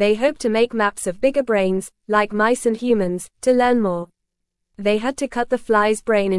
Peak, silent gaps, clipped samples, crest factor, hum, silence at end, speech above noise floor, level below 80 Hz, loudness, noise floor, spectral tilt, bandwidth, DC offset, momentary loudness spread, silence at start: -4 dBFS; none; under 0.1%; 16 dB; none; 0 s; 59 dB; -50 dBFS; -20 LUFS; -77 dBFS; -5 dB/octave; 12 kHz; 0.1%; 7 LU; 0 s